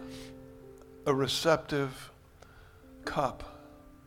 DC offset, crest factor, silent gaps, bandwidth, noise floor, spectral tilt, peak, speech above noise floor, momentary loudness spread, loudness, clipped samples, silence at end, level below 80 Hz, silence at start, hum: under 0.1%; 24 dB; none; 17.5 kHz; -55 dBFS; -4.5 dB/octave; -10 dBFS; 25 dB; 24 LU; -31 LUFS; under 0.1%; 0.1 s; -56 dBFS; 0 s; none